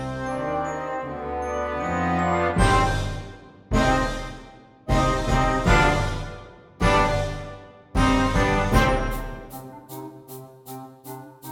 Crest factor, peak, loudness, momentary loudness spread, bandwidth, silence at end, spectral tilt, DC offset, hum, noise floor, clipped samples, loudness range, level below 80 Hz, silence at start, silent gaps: 18 dB; -4 dBFS; -23 LUFS; 20 LU; 18 kHz; 0 s; -5.5 dB/octave; under 0.1%; none; -46 dBFS; under 0.1%; 2 LU; -30 dBFS; 0 s; none